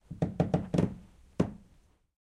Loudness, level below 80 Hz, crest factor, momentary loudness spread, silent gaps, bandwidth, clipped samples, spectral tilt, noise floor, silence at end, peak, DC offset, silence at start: -32 LUFS; -52 dBFS; 20 dB; 14 LU; none; 10.5 kHz; under 0.1%; -8.5 dB/octave; -64 dBFS; 0.65 s; -12 dBFS; under 0.1%; 0.1 s